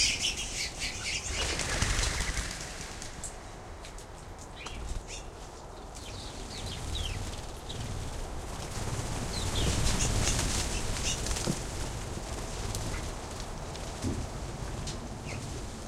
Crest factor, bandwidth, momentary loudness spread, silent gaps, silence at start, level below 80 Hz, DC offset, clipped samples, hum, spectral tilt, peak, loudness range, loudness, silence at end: 24 dB; 16.5 kHz; 14 LU; none; 0 s; -40 dBFS; under 0.1%; under 0.1%; none; -3 dB/octave; -10 dBFS; 10 LU; -34 LUFS; 0 s